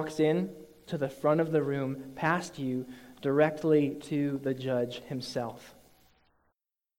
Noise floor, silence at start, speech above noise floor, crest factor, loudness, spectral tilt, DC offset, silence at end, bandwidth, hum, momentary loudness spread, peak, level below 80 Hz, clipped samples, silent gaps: -82 dBFS; 0 s; 53 dB; 20 dB; -30 LUFS; -6.5 dB/octave; under 0.1%; 1.25 s; 16.5 kHz; none; 12 LU; -12 dBFS; -68 dBFS; under 0.1%; none